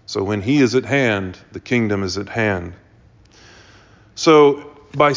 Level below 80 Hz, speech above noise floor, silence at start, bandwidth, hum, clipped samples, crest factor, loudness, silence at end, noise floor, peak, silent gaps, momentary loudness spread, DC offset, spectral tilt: -46 dBFS; 33 dB; 0.1 s; 7.6 kHz; none; under 0.1%; 18 dB; -17 LUFS; 0 s; -50 dBFS; -2 dBFS; none; 19 LU; under 0.1%; -5.5 dB/octave